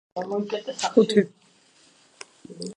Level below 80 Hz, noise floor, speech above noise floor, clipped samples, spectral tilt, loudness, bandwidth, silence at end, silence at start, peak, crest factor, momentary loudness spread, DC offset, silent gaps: -76 dBFS; -58 dBFS; 35 dB; under 0.1%; -5 dB/octave; -24 LUFS; 10.5 kHz; 0.05 s; 0.15 s; -4 dBFS; 22 dB; 25 LU; under 0.1%; none